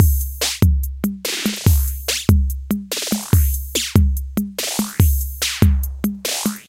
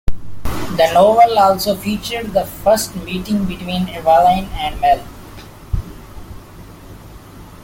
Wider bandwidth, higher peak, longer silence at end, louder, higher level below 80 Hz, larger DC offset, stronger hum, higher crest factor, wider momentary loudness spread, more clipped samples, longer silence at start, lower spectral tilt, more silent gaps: about the same, 17 kHz vs 17 kHz; about the same, 0 dBFS vs -2 dBFS; about the same, 0.05 s vs 0 s; second, -19 LUFS vs -16 LUFS; first, -22 dBFS vs -32 dBFS; neither; neither; about the same, 18 dB vs 16 dB; second, 6 LU vs 25 LU; neither; about the same, 0 s vs 0.05 s; about the same, -4.5 dB/octave vs -5 dB/octave; neither